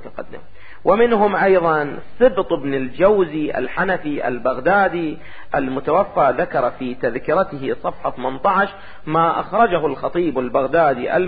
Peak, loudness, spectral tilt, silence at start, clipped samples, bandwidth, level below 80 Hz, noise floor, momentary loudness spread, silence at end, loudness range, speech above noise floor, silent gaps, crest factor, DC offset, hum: -2 dBFS; -18 LUFS; -11 dB/octave; 0 s; under 0.1%; 4.9 kHz; -46 dBFS; -42 dBFS; 9 LU; 0 s; 3 LU; 24 dB; none; 16 dB; 2%; none